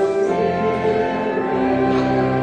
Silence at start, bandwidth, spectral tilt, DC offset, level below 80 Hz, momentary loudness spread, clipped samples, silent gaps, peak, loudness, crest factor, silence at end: 0 s; 9.2 kHz; -7.5 dB/octave; under 0.1%; -46 dBFS; 3 LU; under 0.1%; none; -6 dBFS; -19 LUFS; 12 dB; 0 s